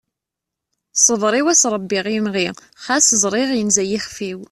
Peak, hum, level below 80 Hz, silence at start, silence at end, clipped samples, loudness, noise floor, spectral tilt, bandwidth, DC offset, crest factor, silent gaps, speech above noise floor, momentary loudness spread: 0 dBFS; none; -58 dBFS; 0.95 s; 0.05 s; under 0.1%; -16 LUFS; -83 dBFS; -2 dB/octave; 13 kHz; under 0.1%; 18 dB; none; 66 dB; 11 LU